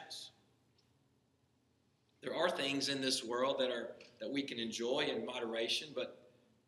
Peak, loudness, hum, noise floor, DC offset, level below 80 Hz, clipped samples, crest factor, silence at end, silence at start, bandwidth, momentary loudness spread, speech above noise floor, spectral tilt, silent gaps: -20 dBFS; -37 LUFS; none; -76 dBFS; under 0.1%; -86 dBFS; under 0.1%; 20 dB; 0.5 s; 0 s; 13 kHz; 13 LU; 37 dB; -2.5 dB/octave; none